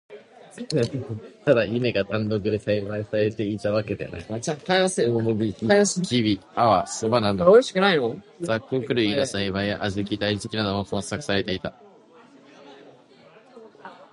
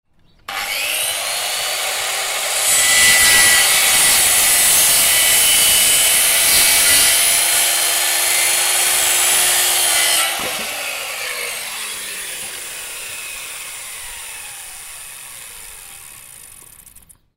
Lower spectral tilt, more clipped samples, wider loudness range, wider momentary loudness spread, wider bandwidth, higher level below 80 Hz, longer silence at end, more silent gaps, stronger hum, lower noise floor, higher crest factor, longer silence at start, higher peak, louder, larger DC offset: first, -5 dB/octave vs 2 dB/octave; neither; second, 8 LU vs 19 LU; second, 11 LU vs 19 LU; second, 11.5 kHz vs 16.5 kHz; about the same, -52 dBFS vs -48 dBFS; second, 0.1 s vs 0.45 s; neither; neither; first, -52 dBFS vs -46 dBFS; about the same, 20 dB vs 16 dB; second, 0.1 s vs 0.5 s; about the same, -4 dBFS vs -2 dBFS; second, -23 LUFS vs -12 LUFS; neither